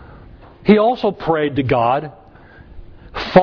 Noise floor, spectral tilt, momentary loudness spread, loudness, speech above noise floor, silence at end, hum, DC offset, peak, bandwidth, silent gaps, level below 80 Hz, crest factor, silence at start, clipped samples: -43 dBFS; -8.5 dB/octave; 14 LU; -17 LUFS; 27 dB; 0 s; none; under 0.1%; 0 dBFS; 5.4 kHz; none; -42 dBFS; 18 dB; 0.65 s; under 0.1%